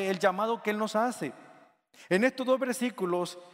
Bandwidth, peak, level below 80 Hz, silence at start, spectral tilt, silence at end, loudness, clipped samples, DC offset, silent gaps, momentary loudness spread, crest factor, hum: 16 kHz; -10 dBFS; -82 dBFS; 0 s; -5 dB/octave; 0.05 s; -29 LUFS; under 0.1%; under 0.1%; none; 5 LU; 20 dB; none